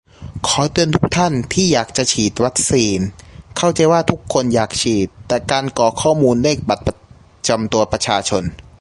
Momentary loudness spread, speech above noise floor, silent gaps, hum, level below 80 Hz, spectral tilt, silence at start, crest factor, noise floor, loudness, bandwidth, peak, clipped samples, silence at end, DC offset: 8 LU; 29 dB; none; none; -40 dBFS; -4 dB/octave; 0.2 s; 16 dB; -45 dBFS; -16 LUFS; 11.5 kHz; 0 dBFS; under 0.1%; 0.2 s; under 0.1%